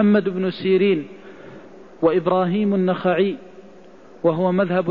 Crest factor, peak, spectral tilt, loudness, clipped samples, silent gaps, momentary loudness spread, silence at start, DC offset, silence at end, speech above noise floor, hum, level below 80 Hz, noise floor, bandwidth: 14 dB; -6 dBFS; -9.5 dB/octave; -20 LUFS; under 0.1%; none; 20 LU; 0 s; 0.4%; 0 s; 27 dB; none; -62 dBFS; -45 dBFS; 5.2 kHz